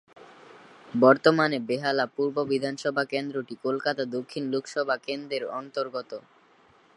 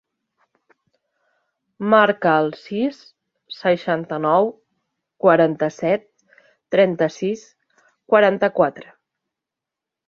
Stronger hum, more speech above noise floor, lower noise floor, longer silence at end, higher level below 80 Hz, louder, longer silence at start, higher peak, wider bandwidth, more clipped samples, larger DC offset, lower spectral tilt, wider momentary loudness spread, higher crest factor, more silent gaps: neither; second, 33 dB vs 68 dB; second, -59 dBFS vs -86 dBFS; second, 0.75 s vs 1.25 s; second, -76 dBFS vs -68 dBFS; second, -27 LUFS vs -19 LUFS; second, 0.2 s vs 1.8 s; about the same, -4 dBFS vs -2 dBFS; first, 11.5 kHz vs 7.2 kHz; neither; neither; about the same, -5.5 dB/octave vs -6.5 dB/octave; first, 13 LU vs 10 LU; about the same, 22 dB vs 20 dB; neither